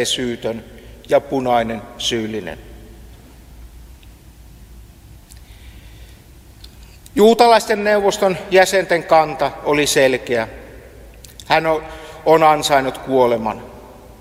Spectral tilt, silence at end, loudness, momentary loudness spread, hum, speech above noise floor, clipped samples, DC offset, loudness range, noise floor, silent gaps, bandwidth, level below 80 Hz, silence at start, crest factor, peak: -3.5 dB/octave; 0.3 s; -16 LUFS; 16 LU; none; 27 dB; under 0.1%; under 0.1%; 10 LU; -42 dBFS; none; 16 kHz; -44 dBFS; 0 s; 18 dB; 0 dBFS